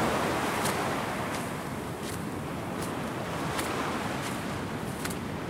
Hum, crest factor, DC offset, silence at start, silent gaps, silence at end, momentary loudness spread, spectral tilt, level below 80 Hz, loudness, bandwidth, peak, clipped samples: none; 18 dB; under 0.1%; 0 s; none; 0 s; 7 LU; -4.5 dB/octave; -54 dBFS; -32 LUFS; 16 kHz; -14 dBFS; under 0.1%